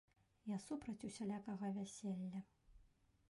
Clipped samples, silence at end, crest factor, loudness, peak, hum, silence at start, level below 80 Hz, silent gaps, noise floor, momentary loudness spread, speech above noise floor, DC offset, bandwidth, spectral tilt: under 0.1%; 0.45 s; 14 dB; -48 LUFS; -36 dBFS; none; 0.45 s; -76 dBFS; none; -74 dBFS; 7 LU; 27 dB; under 0.1%; 11.5 kHz; -6 dB/octave